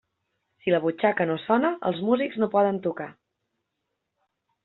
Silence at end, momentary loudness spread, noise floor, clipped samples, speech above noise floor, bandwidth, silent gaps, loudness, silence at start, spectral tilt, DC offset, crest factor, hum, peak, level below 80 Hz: 1.55 s; 9 LU; -81 dBFS; under 0.1%; 57 dB; 4.2 kHz; none; -25 LUFS; 0.65 s; -5 dB/octave; under 0.1%; 20 dB; none; -8 dBFS; -70 dBFS